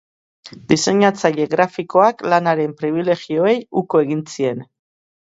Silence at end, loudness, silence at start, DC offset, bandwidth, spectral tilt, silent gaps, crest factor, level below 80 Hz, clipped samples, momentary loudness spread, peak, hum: 0.6 s; -17 LUFS; 0.45 s; under 0.1%; 8 kHz; -5 dB/octave; none; 18 dB; -60 dBFS; under 0.1%; 7 LU; 0 dBFS; none